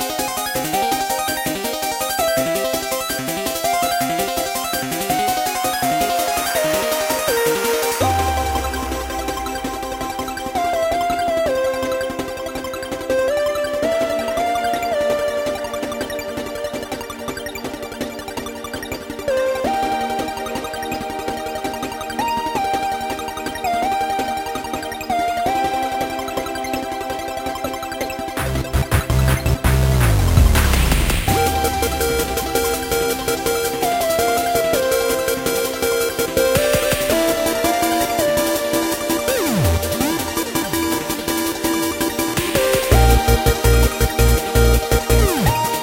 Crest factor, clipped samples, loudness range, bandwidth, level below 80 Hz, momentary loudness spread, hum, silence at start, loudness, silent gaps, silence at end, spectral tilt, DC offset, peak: 18 dB; under 0.1%; 6 LU; 17 kHz; -26 dBFS; 9 LU; none; 0 s; -19 LUFS; none; 0 s; -4 dB/octave; under 0.1%; -2 dBFS